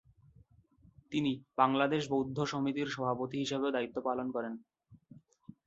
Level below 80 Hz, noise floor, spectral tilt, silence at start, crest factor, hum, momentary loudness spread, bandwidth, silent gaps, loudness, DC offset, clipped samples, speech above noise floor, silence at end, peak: -70 dBFS; -64 dBFS; -4.5 dB/octave; 1.1 s; 22 dB; none; 8 LU; 7.8 kHz; none; -34 LUFS; under 0.1%; under 0.1%; 31 dB; 0.5 s; -12 dBFS